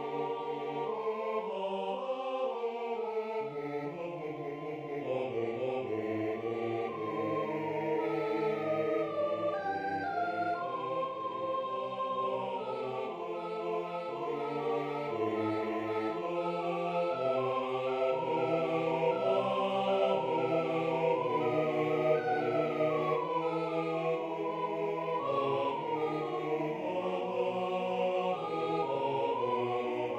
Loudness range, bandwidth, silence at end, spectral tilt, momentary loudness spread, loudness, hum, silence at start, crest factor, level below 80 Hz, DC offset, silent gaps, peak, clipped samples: 5 LU; 8.8 kHz; 0 s; -7 dB/octave; 6 LU; -33 LUFS; none; 0 s; 16 dB; -76 dBFS; under 0.1%; none; -16 dBFS; under 0.1%